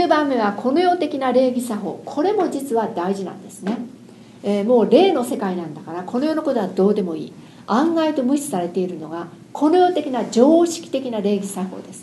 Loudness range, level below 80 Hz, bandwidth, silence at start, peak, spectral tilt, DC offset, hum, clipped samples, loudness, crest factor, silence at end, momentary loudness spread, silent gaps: 3 LU; -70 dBFS; 12.5 kHz; 0 s; 0 dBFS; -5.5 dB/octave; under 0.1%; none; under 0.1%; -20 LUFS; 20 dB; 0 s; 15 LU; none